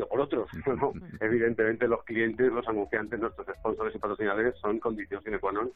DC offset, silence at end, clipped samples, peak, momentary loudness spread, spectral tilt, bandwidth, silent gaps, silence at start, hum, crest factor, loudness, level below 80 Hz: under 0.1%; 0.05 s; under 0.1%; -12 dBFS; 7 LU; -9 dB/octave; 4.1 kHz; none; 0 s; none; 16 dB; -30 LUFS; -54 dBFS